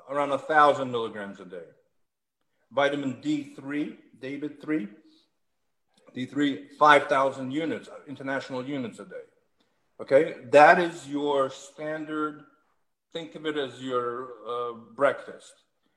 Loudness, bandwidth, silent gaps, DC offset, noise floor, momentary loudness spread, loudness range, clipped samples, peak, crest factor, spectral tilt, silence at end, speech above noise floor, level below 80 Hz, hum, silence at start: -26 LUFS; 11 kHz; none; under 0.1%; -82 dBFS; 21 LU; 10 LU; under 0.1%; -2 dBFS; 24 dB; -5 dB/octave; 0.6 s; 56 dB; -78 dBFS; none; 0.05 s